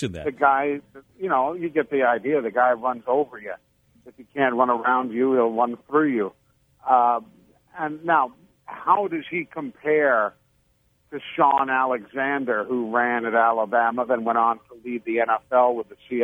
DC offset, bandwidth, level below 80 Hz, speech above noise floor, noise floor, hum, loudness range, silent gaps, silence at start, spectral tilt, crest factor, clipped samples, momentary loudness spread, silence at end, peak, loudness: under 0.1%; 7.2 kHz; -64 dBFS; 42 dB; -65 dBFS; none; 2 LU; none; 0 s; -7 dB/octave; 20 dB; under 0.1%; 12 LU; 0 s; -4 dBFS; -22 LUFS